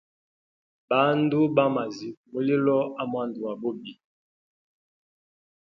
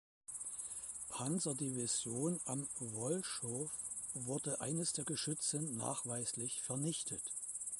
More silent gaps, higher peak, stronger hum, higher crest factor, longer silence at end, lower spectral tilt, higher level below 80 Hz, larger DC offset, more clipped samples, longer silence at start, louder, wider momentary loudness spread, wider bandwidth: first, 2.17-2.24 s vs none; first, -8 dBFS vs -24 dBFS; neither; about the same, 20 dB vs 18 dB; first, 1.85 s vs 0 s; first, -7.5 dB/octave vs -3.5 dB/octave; about the same, -74 dBFS vs -76 dBFS; neither; neither; first, 0.9 s vs 0.3 s; first, -25 LUFS vs -40 LUFS; first, 13 LU vs 6 LU; second, 7 kHz vs 12 kHz